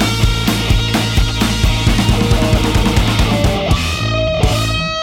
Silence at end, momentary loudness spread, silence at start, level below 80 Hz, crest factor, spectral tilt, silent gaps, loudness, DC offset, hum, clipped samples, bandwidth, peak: 0 s; 2 LU; 0 s; -18 dBFS; 12 dB; -5 dB/octave; none; -14 LUFS; under 0.1%; none; under 0.1%; 17 kHz; -2 dBFS